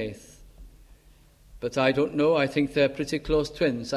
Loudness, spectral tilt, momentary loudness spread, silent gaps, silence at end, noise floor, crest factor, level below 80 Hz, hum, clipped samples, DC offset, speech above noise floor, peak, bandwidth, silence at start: -25 LUFS; -5.5 dB/octave; 11 LU; none; 0 s; -56 dBFS; 18 dB; -48 dBFS; none; under 0.1%; under 0.1%; 31 dB; -8 dBFS; 13 kHz; 0 s